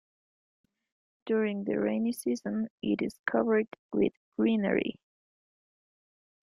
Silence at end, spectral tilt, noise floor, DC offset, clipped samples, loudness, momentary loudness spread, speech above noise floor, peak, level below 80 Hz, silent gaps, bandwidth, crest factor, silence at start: 1.5 s; -6.5 dB/octave; under -90 dBFS; under 0.1%; under 0.1%; -30 LUFS; 6 LU; over 61 dB; -12 dBFS; -70 dBFS; 2.70-2.78 s, 3.19-3.24 s, 3.79-3.90 s, 4.17-4.32 s; 15.5 kHz; 20 dB; 1.25 s